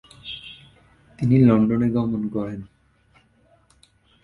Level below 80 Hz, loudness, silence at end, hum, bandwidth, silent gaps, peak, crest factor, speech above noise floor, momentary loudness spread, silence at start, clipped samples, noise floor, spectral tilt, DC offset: -52 dBFS; -20 LUFS; 1.6 s; none; 5.4 kHz; none; -4 dBFS; 18 dB; 40 dB; 20 LU; 0.25 s; under 0.1%; -59 dBFS; -9.5 dB/octave; under 0.1%